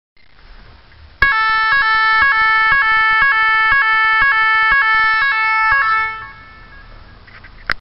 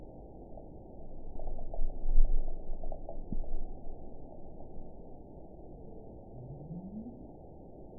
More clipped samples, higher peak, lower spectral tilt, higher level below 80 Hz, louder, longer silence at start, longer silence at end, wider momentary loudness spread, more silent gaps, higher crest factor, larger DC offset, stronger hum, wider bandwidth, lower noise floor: neither; first, 0 dBFS vs -10 dBFS; second, 2.5 dB/octave vs -14.5 dB/octave; about the same, -38 dBFS vs -34 dBFS; first, -12 LUFS vs -45 LUFS; first, 1.2 s vs 0 s; about the same, 0 s vs 0 s; second, 5 LU vs 14 LU; neither; second, 14 dB vs 22 dB; first, 0.4% vs 0.1%; neither; first, 5.8 kHz vs 1 kHz; second, -43 dBFS vs -50 dBFS